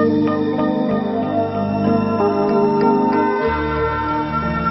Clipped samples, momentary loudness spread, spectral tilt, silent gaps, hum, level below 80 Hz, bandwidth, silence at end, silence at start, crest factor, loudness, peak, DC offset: under 0.1%; 5 LU; -9.5 dB/octave; none; none; -38 dBFS; 6 kHz; 0 s; 0 s; 14 dB; -18 LUFS; -4 dBFS; under 0.1%